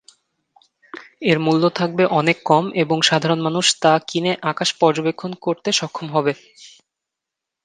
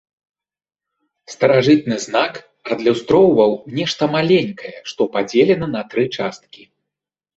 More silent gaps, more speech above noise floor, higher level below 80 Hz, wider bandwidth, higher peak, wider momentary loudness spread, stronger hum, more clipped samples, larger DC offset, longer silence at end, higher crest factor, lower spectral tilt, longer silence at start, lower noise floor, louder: neither; second, 65 dB vs 69 dB; second, -66 dBFS vs -56 dBFS; first, 10 kHz vs 8 kHz; about the same, 0 dBFS vs -2 dBFS; second, 8 LU vs 13 LU; neither; neither; neither; first, 0.95 s vs 0.8 s; about the same, 20 dB vs 16 dB; second, -4 dB/octave vs -5.5 dB/octave; second, 0.95 s vs 1.3 s; about the same, -84 dBFS vs -85 dBFS; about the same, -18 LUFS vs -17 LUFS